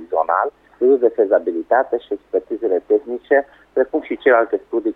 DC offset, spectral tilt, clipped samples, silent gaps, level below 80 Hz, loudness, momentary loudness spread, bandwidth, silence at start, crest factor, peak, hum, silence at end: under 0.1%; -7 dB/octave; under 0.1%; none; -60 dBFS; -18 LUFS; 8 LU; 3.9 kHz; 0 s; 14 dB; -4 dBFS; none; 0.05 s